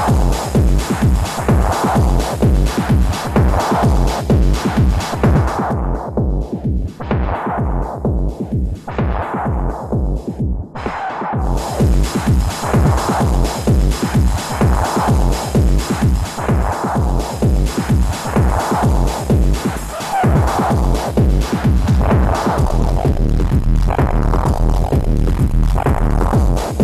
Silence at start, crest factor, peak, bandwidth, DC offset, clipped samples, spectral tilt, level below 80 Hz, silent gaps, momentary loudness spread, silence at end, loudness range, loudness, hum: 0 s; 12 dB; -2 dBFS; 14 kHz; under 0.1%; under 0.1%; -6.5 dB/octave; -18 dBFS; none; 6 LU; 0 s; 5 LU; -17 LUFS; none